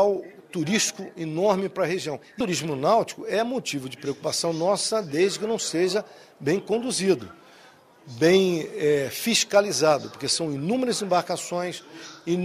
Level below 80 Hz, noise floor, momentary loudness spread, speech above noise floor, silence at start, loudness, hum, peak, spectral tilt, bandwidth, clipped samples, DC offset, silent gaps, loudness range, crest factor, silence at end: -66 dBFS; -53 dBFS; 11 LU; 28 dB; 0 s; -24 LUFS; none; -6 dBFS; -4 dB/octave; 15.5 kHz; under 0.1%; under 0.1%; none; 3 LU; 20 dB; 0 s